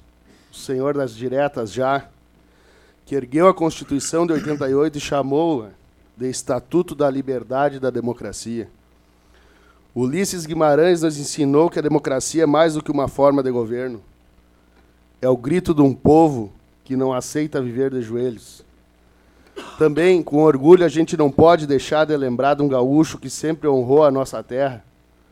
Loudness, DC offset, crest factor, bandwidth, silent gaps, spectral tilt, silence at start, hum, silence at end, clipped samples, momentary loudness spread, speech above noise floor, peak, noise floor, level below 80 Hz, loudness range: -19 LUFS; under 0.1%; 20 dB; 15 kHz; none; -6 dB/octave; 0.55 s; none; 0.5 s; under 0.1%; 13 LU; 37 dB; 0 dBFS; -55 dBFS; -50 dBFS; 8 LU